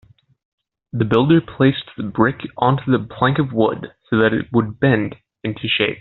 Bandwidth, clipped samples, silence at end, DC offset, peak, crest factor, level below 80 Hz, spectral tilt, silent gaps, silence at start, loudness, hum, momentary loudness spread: 4.3 kHz; under 0.1%; 0 s; under 0.1%; -2 dBFS; 16 dB; -50 dBFS; -5 dB/octave; none; 0.95 s; -18 LUFS; none; 11 LU